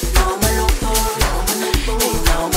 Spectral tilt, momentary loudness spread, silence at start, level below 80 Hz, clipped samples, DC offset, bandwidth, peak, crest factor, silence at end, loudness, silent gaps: -3.5 dB/octave; 2 LU; 0 s; -20 dBFS; under 0.1%; 0.3%; 16.5 kHz; 0 dBFS; 16 dB; 0 s; -17 LUFS; none